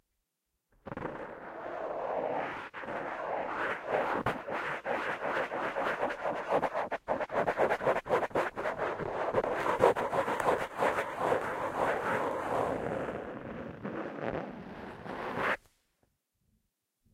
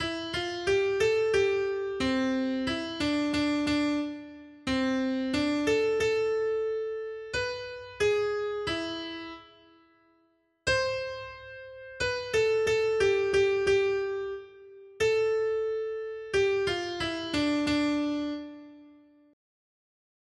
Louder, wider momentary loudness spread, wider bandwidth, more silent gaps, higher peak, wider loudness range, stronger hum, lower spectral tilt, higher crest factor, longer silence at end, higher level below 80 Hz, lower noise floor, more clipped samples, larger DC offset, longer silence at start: second, -33 LUFS vs -28 LUFS; about the same, 11 LU vs 13 LU; first, 16 kHz vs 11.5 kHz; neither; first, -10 dBFS vs -14 dBFS; first, 8 LU vs 5 LU; neither; about the same, -5.5 dB/octave vs -4.5 dB/octave; first, 24 dB vs 16 dB; first, 1.55 s vs 1.4 s; second, -62 dBFS vs -56 dBFS; first, -84 dBFS vs -69 dBFS; neither; neither; first, 0.85 s vs 0 s